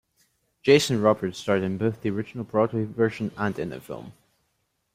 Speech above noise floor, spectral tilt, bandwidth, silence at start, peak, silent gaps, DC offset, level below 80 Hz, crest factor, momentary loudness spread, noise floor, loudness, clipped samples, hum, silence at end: 50 dB; -5.5 dB/octave; 16 kHz; 0.65 s; -4 dBFS; none; under 0.1%; -62 dBFS; 20 dB; 14 LU; -74 dBFS; -25 LUFS; under 0.1%; none; 0.85 s